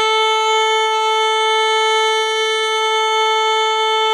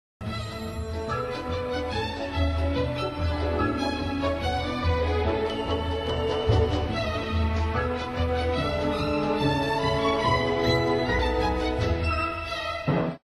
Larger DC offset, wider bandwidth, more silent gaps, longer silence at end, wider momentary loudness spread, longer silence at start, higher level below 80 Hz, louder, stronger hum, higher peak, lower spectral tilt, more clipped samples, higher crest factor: neither; first, 15 kHz vs 12.5 kHz; neither; second, 0 s vs 0.15 s; second, 2 LU vs 6 LU; second, 0 s vs 0.2 s; second, under -90 dBFS vs -34 dBFS; first, -15 LUFS vs -27 LUFS; neither; first, -6 dBFS vs -10 dBFS; second, 4 dB/octave vs -6.5 dB/octave; neither; second, 10 dB vs 16 dB